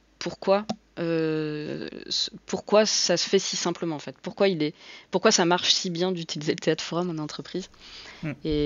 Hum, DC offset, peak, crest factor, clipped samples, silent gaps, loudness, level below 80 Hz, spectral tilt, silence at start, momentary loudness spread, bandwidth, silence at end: none; under 0.1%; -6 dBFS; 20 dB; under 0.1%; none; -25 LUFS; -54 dBFS; -3.5 dB/octave; 0.2 s; 15 LU; 7.8 kHz; 0 s